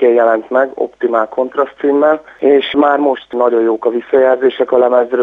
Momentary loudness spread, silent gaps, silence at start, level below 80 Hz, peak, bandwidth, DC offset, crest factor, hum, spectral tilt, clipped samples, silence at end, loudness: 5 LU; none; 0 s; -60 dBFS; 0 dBFS; 4 kHz; under 0.1%; 12 dB; none; -6.5 dB/octave; under 0.1%; 0 s; -13 LUFS